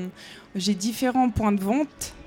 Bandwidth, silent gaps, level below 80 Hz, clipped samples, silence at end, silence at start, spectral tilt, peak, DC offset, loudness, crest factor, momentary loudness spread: 17.5 kHz; none; -46 dBFS; under 0.1%; 0 s; 0 s; -5 dB/octave; -10 dBFS; under 0.1%; -24 LUFS; 14 dB; 13 LU